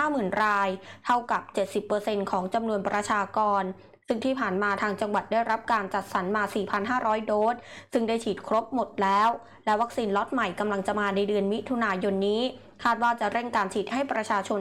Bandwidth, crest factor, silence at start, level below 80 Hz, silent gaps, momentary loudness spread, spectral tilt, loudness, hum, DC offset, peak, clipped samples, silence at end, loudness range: 15.5 kHz; 12 dB; 0 s; -64 dBFS; none; 5 LU; -5 dB/octave; -27 LUFS; none; under 0.1%; -14 dBFS; under 0.1%; 0 s; 1 LU